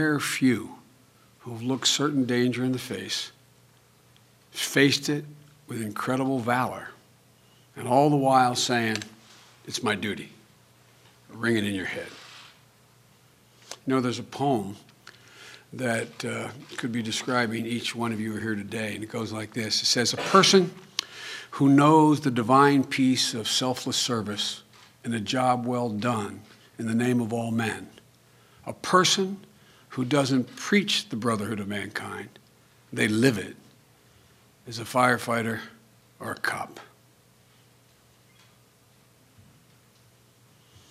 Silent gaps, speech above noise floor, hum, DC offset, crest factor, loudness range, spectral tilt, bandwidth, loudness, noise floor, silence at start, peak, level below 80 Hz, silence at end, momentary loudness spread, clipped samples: none; 34 dB; none; under 0.1%; 24 dB; 10 LU; -4 dB/octave; 16 kHz; -25 LUFS; -59 dBFS; 0 s; -4 dBFS; -70 dBFS; 4.05 s; 19 LU; under 0.1%